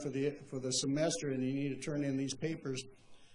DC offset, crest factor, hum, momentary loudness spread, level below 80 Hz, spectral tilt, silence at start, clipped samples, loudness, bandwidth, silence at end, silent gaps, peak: under 0.1%; 18 dB; none; 8 LU; -70 dBFS; -4.5 dB/octave; 0 s; under 0.1%; -37 LUFS; 11 kHz; 0 s; none; -20 dBFS